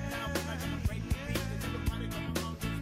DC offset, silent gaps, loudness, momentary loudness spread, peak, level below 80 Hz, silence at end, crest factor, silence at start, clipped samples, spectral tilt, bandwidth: under 0.1%; none; -35 LUFS; 2 LU; -18 dBFS; -40 dBFS; 0 s; 18 dB; 0 s; under 0.1%; -5 dB/octave; 16 kHz